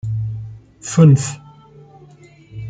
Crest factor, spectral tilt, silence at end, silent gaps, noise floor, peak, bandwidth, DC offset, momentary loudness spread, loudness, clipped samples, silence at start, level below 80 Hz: 16 dB; -7 dB/octave; 0 s; none; -45 dBFS; -2 dBFS; 9.4 kHz; under 0.1%; 25 LU; -15 LUFS; under 0.1%; 0.05 s; -48 dBFS